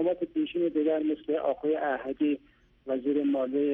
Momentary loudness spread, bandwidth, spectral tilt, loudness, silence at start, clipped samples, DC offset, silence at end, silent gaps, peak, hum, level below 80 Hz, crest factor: 5 LU; 3.7 kHz; -8.5 dB/octave; -29 LUFS; 0 s; under 0.1%; under 0.1%; 0 s; none; -16 dBFS; none; -66 dBFS; 12 dB